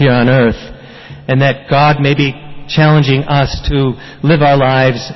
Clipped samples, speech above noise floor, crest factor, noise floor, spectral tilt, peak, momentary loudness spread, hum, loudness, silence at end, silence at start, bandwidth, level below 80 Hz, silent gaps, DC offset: under 0.1%; 22 dB; 10 dB; -32 dBFS; -7.5 dB/octave; 0 dBFS; 9 LU; none; -11 LUFS; 0 s; 0 s; 6 kHz; -30 dBFS; none; 0.4%